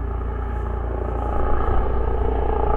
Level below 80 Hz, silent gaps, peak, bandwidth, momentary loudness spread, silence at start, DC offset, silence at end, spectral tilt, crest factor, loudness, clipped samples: -24 dBFS; none; -6 dBFS; 3.4 kHz; 5 LU; 0 s; under 0.1%; 0 s; -10 dB/octave; 14 dB; -25 LUFS; under 0.1%